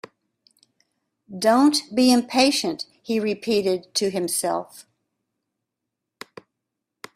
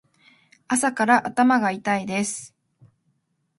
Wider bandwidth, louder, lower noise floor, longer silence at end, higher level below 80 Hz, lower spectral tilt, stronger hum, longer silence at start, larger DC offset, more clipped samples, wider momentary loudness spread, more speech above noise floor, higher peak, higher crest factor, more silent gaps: first, 15.5 kHz vs 11.5 kHz; about the same, -21 LUFS vs -21 LUFS; first, -83 dBFS vs -70 dBFS; first, 2.35 s vs 1.1 s; about the same, -66 dBFS vs -70 dBFS; about the same, -3.5 dB/octave vs -4 dB/octave; neither; first, 1.3 s vs 0.7 s; neither; neither; first, 23 LU vs 8 LU; first, 62 dB vs 49 dB; about the same, -4 dBFS vs -4 dBFS; about the same, 20 dB vs 20 dB; neither